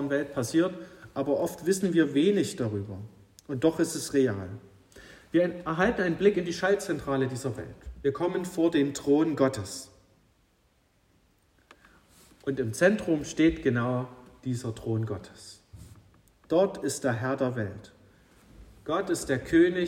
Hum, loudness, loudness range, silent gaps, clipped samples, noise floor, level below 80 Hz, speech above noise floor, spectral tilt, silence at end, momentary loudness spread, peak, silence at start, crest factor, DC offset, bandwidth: none; -28 LUFS; 4 LU; none; under 0.1%; -67 dBFS; -56 dBFS; 40 dB; -5.5 dB/octave; 0 s; 16 LU; -8 dBFS; 0 s; 20 dB; under 0.1%; 16 kHz